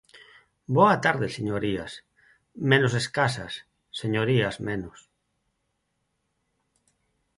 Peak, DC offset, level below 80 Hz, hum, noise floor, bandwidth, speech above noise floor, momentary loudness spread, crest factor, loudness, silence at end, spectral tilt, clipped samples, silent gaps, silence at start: -6 dBFS; under 0.1%; -58 dBFS; none; -77 dBFS; 11.5 kHz; 52 dB; 19 LU; 22 dB; -25 LUFS; 2.5 s; -5.5 dB/octave; under 0.1%; none; 0.15 s